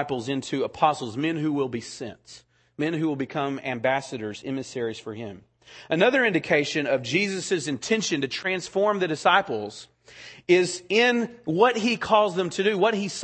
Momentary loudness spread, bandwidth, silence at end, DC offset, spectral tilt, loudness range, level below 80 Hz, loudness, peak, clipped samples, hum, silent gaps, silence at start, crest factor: 13 LU; 8.8 kHz; 0 s; under 0.1%; -4.5 dB/octave; 6 LU; -66 dBFS; -24 LUFS; -4 dBFS; under 0.1%; none; none; 0 s; 20 dB